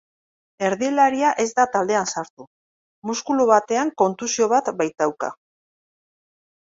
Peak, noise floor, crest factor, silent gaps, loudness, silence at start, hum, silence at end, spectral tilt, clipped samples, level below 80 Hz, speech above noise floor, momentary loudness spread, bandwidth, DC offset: -2 dBFS; under -90 dBFS; 20 dB; 2.30-2.37 s, 2.47-3.02 s; -21 LUFS; 0.6 s; none; 1.3 s; -3.5 dB/octave; under 0.1%; -68 dBFS; over 70 dB; 12 LU; 8 kHz; under 0.1%